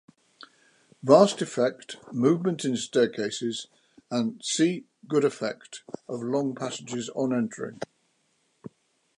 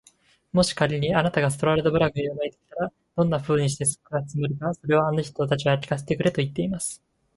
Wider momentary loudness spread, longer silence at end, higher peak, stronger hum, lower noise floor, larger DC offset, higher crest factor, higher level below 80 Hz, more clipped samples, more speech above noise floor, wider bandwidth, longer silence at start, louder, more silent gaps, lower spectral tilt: first, 16 LU vs 9 LU; about the same, 0.5 s vs 0.4 s; about the same, -4 dBFS vs -4 dBFS; neither; first, -71 dBFS vs -59 dBFS; neither; about the same, 24 dB vs 20 dB; second, -76 dBFS vs -52 dBFS; neither; first, 45 dB vs 36 dB; about the same, 11.5 kHz vs 11.5 kHz; first, 1.05 s vs 0.55 s; about the same, -26 LUFS vs -24 LUFS; neither; about the same, -5 dB/octave vs -5 dB/octave